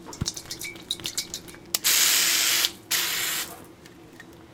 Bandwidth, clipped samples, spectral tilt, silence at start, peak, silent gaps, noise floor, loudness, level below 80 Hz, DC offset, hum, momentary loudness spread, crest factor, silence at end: 18 kHz; under 0.1%; 0.5 dB/octave; 0 s; -2 dBFS; none; -48 dBFS; -23 LUFS; -56 dBFS; under 0.1%; none; 17 LU; 26 dB; 0.1 s